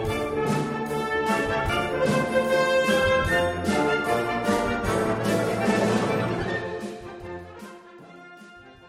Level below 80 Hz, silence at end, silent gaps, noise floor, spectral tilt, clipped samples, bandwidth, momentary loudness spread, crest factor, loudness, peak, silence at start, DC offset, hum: -44 dBFS; 0 s; none; -47 dBFS; -5 dB/octave; under 0.1%; 16 kHz; 17 LU; 16 dB; -24 LUFS; -10 dBFS; 0 s; under 0.1%; none